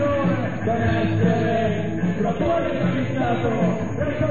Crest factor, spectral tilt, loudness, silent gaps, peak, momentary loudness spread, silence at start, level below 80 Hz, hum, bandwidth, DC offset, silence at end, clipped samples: 14 dB; -8 dB/octave; -22 LUFS; none; -6 dBFS; 4 LU; 0 s; -42 dBFS; none; 7.2 kHz; 2%; 0 s; under 0.1%